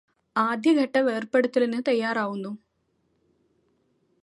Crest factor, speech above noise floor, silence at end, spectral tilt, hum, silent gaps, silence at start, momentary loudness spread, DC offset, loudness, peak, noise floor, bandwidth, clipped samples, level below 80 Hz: 18 dB; 48 dB; 1.7 s; -5.5 dB/octave; none; none; 0.35 s; 11 LU; under 0.1%; -24 LUFS; -10 dBFS; -71 dBFS; 11.5 kHz; under 0.1%; -80 dBFS